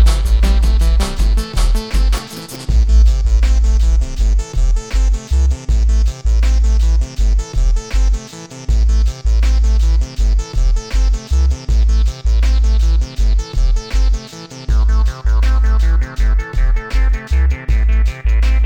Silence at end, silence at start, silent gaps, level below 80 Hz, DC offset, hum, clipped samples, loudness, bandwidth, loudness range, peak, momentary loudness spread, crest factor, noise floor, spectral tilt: 0 s; 0 s; none; -12 dBFS; under 0.1%; none; under 0.1%; -16 LUFS; 10 kHz; 1 LU; -2 dBFS; 5 LU; 10 dB; -32 dBFS; -5.5 dB/octave